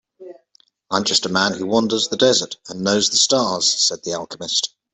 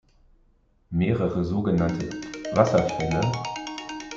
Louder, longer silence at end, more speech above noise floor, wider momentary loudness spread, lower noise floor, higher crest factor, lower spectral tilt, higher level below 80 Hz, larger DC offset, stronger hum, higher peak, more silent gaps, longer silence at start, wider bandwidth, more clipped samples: first, -18 LUFS vs -25 LUFS; first, 0.25 s vs 0 s; about the same, 40 dB vs 38 dB; about the same, 10 LU vs 12 LU; about the same, -59 dBFS vs -62 dBFS; about the same, 18 dB vs 22 dB; second, -2 dB/octave vs -6.5 dB/octave; second, -62 dBFS vs -50 dBFS; neither; neither; about the same, -2 dBFS vs -2 dBFS; neither; second, 0.2 s vs 0.9 s; first, 8.6 kHz vs 7.6 kHz; neither